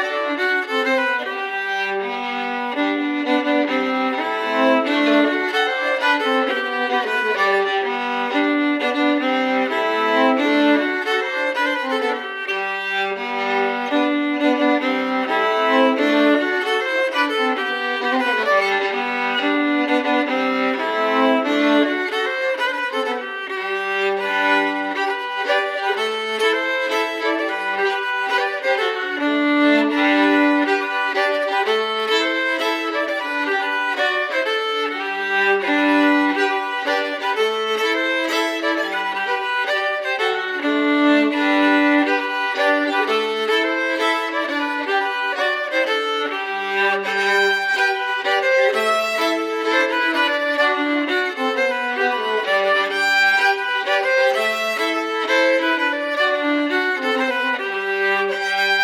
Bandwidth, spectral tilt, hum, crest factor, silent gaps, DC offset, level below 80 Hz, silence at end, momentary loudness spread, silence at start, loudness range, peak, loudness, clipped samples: 15.5 kHz; -2.5 dB/octave; none; 14 dB; none; under 0.1%; -78 dBFS; 0 s; 6 LU; 0 s; 3 LU; -4 dBFS; -19 LUFS; under 0.1%